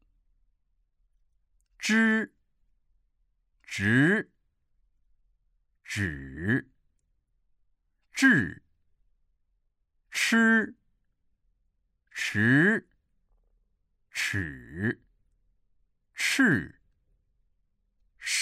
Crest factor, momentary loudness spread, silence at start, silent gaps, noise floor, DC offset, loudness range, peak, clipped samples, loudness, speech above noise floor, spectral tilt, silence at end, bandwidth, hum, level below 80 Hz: 22 dB; 16 LU; 1.8 s; none; -74 dBFS; under 0.1%; 8 LU; -10 dBFS; under 0.1%; -26 LUFS; 49 dB; -4.5 dB/octave; 0 s; 15.5 kHz; none; -60 dBFS